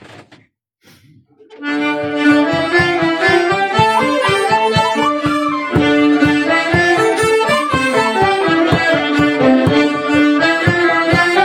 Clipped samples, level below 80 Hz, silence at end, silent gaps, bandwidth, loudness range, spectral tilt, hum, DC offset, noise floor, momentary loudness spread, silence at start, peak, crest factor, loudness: under 0.1%; -44 dBFS; 0 s; none; 15.5 kHz; 2 LU; -5 dB/octave; none; under 0.1%; -54 dBFS; 4 LU; 0.1 s; 0 dBFS; 14 dB; -13 LUFS